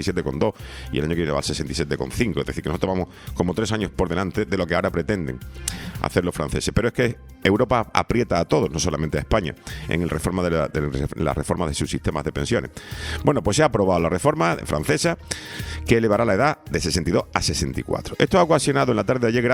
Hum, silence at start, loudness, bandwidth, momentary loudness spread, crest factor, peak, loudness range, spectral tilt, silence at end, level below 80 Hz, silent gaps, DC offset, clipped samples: none; 0 s; -22 LUFS; 19.5 kHz; 9 LU; 22 dB; 0 dBFS; 4 LU; -5 dB/octave; 0 s; -38 dBFS; none; under 0.1%; under 0.1%